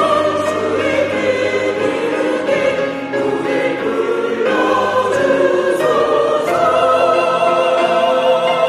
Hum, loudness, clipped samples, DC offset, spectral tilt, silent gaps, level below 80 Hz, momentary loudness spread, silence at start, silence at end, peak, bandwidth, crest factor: none; -15 LUFS; under 0.1%; under 0.1%; -4.5 dB/octave; none; -54 dBFS; 4 LU; 0 s; 0 s; -2 dBFS; 13.5 kHz; 12 dB